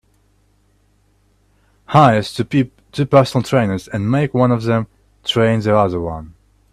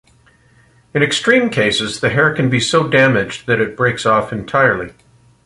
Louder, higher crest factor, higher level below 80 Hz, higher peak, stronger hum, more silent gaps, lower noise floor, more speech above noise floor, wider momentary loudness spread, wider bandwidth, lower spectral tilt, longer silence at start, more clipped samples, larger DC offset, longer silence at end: about the same, -16 LUFS vs -15 LUFS; about the same, 18 dB vs 16 dB; about the same, -48 dBFS vs -48 dBFS; about the same, 0 dBFS vs -2 dBFS; first, 50 Hz at -40 dBFS vs none; neither; first, -57 dBFS vs -51 dBFS; first, 42 dB vs 36 dB; first, 11 LU vs 6 LU; first, 13.5 kHz vs 11.5 kHz; first, -7 dB/octave vs -4.5 dB/octave; first, 1.9 s vs 0.95 s; neither; neither; about the same, 0.45 s vs 0.55 s